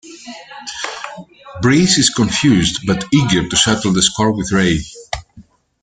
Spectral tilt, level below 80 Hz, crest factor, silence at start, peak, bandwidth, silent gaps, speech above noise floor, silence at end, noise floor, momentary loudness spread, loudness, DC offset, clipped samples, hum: -4 dB/octave; -40 dBFS; 16 dB; 0.05 s; 0 dBFS; 9.6 kHz; none; 31 dB; 0.4 s; -45 dBFS; 19 LU; -14 LUFS; under 0.1%; under 0.1%; none